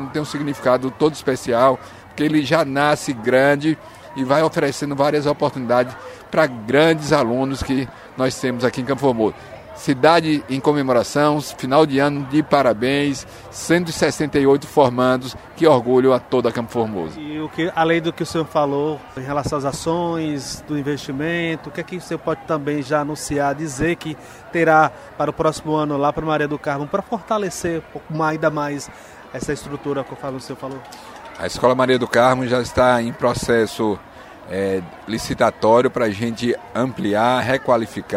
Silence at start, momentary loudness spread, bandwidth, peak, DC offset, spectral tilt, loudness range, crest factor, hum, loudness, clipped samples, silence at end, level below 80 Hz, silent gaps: 0 s; 13 LU; 16 kHz; 0 dBFS; under 0.1%; -5.5 dB/octave; 6 LU; 20 dB; none; -19 LUFS; under 0.1%; 0 s; -48 dBFS; none